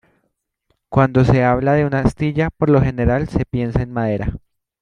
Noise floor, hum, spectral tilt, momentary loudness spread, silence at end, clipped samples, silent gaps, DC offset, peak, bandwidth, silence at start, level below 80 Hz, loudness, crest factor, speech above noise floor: -71 dBFS; none; -9 dB/octave; 7 LU; 0.45 s; under 0.1%; none; under 0.1%; -2 dBFS; 9.6 kHz; 0.9 s; -34 dBFS; -17 LUFS; 16 dB; 55 dB